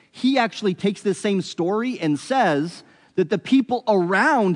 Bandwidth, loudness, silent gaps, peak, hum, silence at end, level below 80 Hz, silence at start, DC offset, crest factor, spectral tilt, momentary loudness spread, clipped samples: 10.5 kHz; -21 LUFS; none; -6 dBFS; none; 0 s; -74 dBFS; 0.15 s; under 0.1%; 16 dB; -5.5 dB/octave; 7 LU; under 0.1%